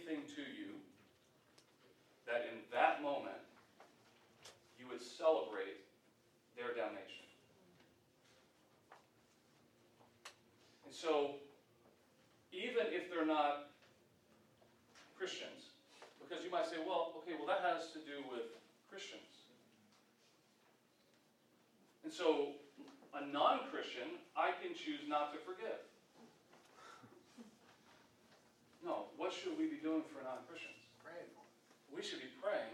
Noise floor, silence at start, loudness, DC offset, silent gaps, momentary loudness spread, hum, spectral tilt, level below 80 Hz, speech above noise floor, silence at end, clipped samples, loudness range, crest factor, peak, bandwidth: -73 dBFS; 0 s; -42 LUFS; under 0.1%; none; 24 LU; none; -3.5 dB/octave; under -90 dBFS; 32 dB; 0 s; under 0.1%; 12 LU; 24 dB; -20 dBFS; 15.5 kHz